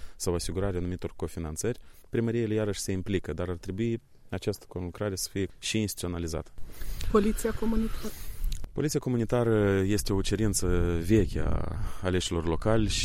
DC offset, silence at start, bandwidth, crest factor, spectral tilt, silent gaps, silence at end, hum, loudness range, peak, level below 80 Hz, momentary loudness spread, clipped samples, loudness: under 0.1%; 0 s; 16.5 kHz; 18 dB; -5.5 dB/octave; none; 0 s; none; 5 LU; -10 dBFS; -38 dBFS; 12 LU; under 0.1%; -30 LUFS